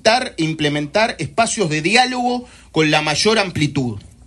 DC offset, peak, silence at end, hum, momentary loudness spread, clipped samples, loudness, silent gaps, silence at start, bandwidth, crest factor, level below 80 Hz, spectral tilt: under 0.1%; 0 dBFS; 0.2 s; none; 8 LU; under 0.1%; -17 LUFS; none; 0.05 s; 12 kHz; 16 dB; -48 dBFS; -4 dB/octave